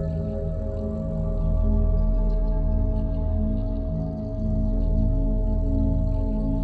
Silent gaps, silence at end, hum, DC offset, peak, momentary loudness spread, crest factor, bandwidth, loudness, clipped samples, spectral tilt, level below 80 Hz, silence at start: none; 0 s; none; under 0.1%; -12 dBFS; 5 LU; 12 dB; 1.8 kHz; -26 LUFS; under 0.1%; -12 dB/octave; -24 dBFS; 0 s